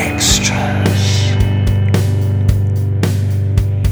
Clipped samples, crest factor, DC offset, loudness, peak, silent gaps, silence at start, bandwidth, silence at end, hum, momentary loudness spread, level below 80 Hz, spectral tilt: under 0.1%; 14 dB; under 0.1%; -14 LUFS; 0 dBFS; none; 0 s; over 20 kHz; 0 s; none; 4 LU; -24 dBFS; -4.5 dB/octave